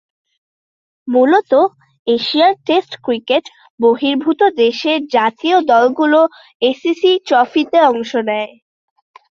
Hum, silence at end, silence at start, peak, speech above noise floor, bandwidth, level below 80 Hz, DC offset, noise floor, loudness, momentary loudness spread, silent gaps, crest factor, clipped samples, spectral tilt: none; 0.9 s; 1.05 s; -2 dBFS; over 76 dB; 7.2 kHz; -64 dBFS; under 0.1%; under -90 dBFS; -14 LUFS; 7 LU; 1.99-2.06 s, 3.70-3.78 s, 6.55-6.60 s; 14 dB; under 0.1%; -4.5 dB/octave